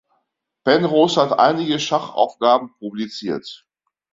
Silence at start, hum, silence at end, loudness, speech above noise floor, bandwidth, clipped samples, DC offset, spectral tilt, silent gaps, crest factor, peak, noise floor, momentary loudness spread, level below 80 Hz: 0.65 s; none; 0.6 s; -18 LUFS; 54 dB; 7.8 kHz; under 0.1%; under 0.1%; -5 dB/octave; none; 18 dB; -2 dBFS; -72 dBFS; 13 LU; -62 dBFS